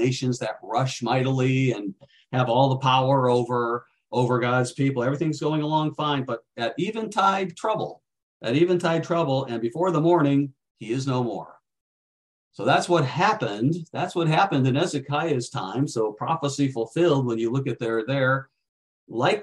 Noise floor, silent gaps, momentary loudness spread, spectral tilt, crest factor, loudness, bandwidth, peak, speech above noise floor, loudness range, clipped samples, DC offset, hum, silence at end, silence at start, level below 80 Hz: under -90 dBFS; 8.23-8.40 s, 10.71-10.75 s, 11.81-12.51 s, 18.69-19.07 s; 9 LU; -6 dB/octave; 18 dB; -24 LUFS; 11 kHz; -6 dBFS; over 67 dB; 3 LU; under 0.1%; under 0.1%; none; 0 s; 0 s; -66 dBFS